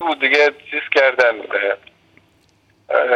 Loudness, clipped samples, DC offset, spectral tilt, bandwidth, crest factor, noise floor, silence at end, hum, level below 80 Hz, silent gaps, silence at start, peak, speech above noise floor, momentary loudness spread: -16 LUFS; under 0.1%; under 0.1%; -2 dB/octave; 8.8 kHz; 18 dB; -57 dBFS; 0 s; none; -68 dBFS; none; 0 s; 0 dBFS; 41 dB; 9 LU